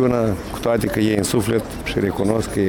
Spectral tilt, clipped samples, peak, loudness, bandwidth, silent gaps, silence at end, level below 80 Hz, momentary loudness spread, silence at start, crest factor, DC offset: -5.5 dB/octave; under 0.1%; -4 dBFS; -20 LUFS; 19 kHz; none; 0 s; -38 dBFS; 4 LU; 0 s; 16 dB; under 0.1%